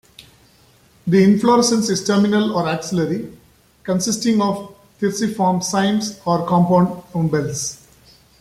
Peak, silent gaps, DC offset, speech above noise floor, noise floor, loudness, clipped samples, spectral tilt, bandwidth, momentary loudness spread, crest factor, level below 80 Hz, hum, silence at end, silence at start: -2 dBFS; none; under 0.1%; 35 dB; -52 dBFS; -18 LUFS; under 0.1%; -5 dB/octave; 14.5 kHz; 10 LU; 16 dB; -54 dBFS; none; 0.65 s; 0.2 s